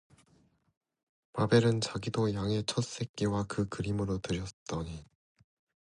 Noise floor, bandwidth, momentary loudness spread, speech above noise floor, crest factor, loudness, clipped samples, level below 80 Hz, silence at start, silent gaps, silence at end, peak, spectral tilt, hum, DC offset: -68 dBFS; 11 kHz; 13 LU; 37 dB; 22 dB; -32 LUFS; under 0.1%; -54 dBFS; 1.35 s; 3.09-3.14 s, 4.53-4.66 s; 0.8 s; -12 dBFS; -6 dB/octave; none; under 0.1%